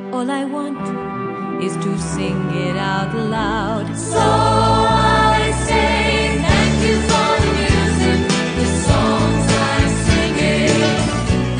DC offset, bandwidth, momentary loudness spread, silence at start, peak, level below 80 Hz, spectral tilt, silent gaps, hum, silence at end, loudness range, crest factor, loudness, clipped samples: under 0.1%; 10 kHz; 8 LU; 0 s; -2 dBFS; -28 dBFS; -5 dB/octave; none; none; 0 s; 6 LU; 14 dB; -16 LUFS; under 0.1%